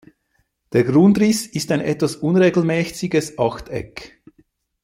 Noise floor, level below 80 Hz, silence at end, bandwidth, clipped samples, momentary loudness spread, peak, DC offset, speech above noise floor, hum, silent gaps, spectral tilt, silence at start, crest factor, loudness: -67 dBFS; -52 dBFS; 0.8 s; 16 kHz; under 0.1%; 16 LU; -2 dBFS; under 0.1%; 50 dB; none; none; -6 dB/octave; 0.75 s; 16 dB; -18 LUFS